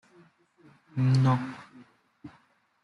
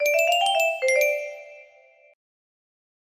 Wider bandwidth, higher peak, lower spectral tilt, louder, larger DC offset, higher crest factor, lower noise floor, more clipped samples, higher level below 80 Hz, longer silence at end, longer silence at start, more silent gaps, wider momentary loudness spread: second, 8.2 kHz vs 15.5 kHz; about the same, -12 dBFS vs -10 dBFS; first, -8 dB/octave vs 2.5 dB/octave; second, -27 LUFS vs -21 LUFS; neither; about the same, 18 dB vs 16 dB; first, -64 dBFS vs -55 dBFS; neither; first, -68 dBFS vs -78 dBFS; second, 0.55 s vs 1.5 s; first, 0.95 s vs 0 s; neither; about the same, 17 LU vs 15 LU